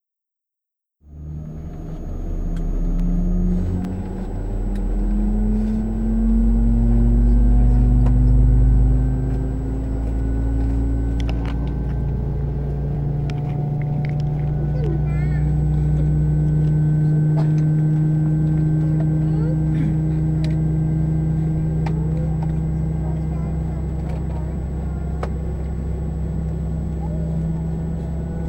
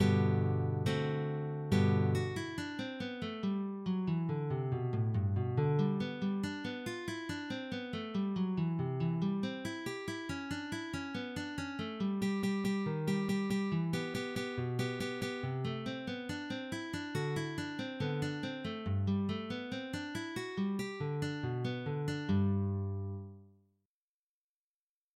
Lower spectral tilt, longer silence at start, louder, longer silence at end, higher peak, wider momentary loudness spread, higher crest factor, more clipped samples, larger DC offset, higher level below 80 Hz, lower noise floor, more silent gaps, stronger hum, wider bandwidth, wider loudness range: first, -10 dB/octave vs -7 dB/octave; first, 1.1 s vs 0 s; first, -21 LUFS vs -36 LUFS; second, 0 s vs 1.7 s; first, -6 dBFS vs -18 dBFS; about the same, 9 LU vs 8 LU; about the same, 14 dB vs 18 dB; neither; neither; first, -22 dBFS vs -68 dBFS; second, -84 dBFS vs under -90 dBFS; neither; neither; second, 8.4 kHz vs 15 kHz; first, 7 LU vs 4 LU